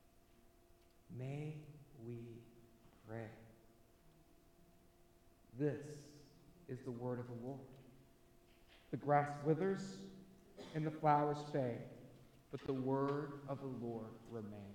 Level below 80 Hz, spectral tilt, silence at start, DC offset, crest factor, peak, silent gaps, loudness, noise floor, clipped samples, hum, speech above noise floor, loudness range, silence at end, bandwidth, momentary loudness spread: -72 dBFS; -8 dB/octave; 0.45 s; under 0.1%; 24 dB; -22 dBFS; none; -42 LUFS; -68 dBFS; under 0.1%; none; 28 dB; 15 LU; 0 s; 17.5 kHz; 23 LU